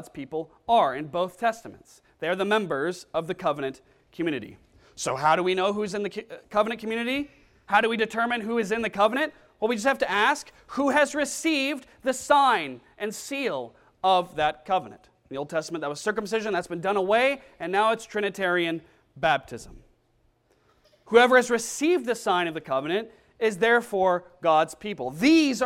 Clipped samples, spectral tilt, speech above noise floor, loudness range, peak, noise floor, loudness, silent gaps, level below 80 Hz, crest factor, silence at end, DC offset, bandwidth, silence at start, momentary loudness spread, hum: under 0.1%; -4 dB/octave; 41 dB; 4 LU; -6 dBFS; -66 dBFS; -25 LUFS; none; -62 dBFS; 20 dB; 0 s; under 0.1%; 16 kHz; 0 s; 12 LU; none